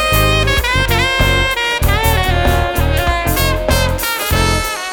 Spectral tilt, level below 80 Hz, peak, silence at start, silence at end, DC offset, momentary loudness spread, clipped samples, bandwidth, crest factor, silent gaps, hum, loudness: -4 dB/octave; -20 dBFS; 0 dBFS; 0 s; 0 s; under 0.1%; 3 LU; under 0.1%; over 20 kHz; 14 dB; none; none; -14 LUFS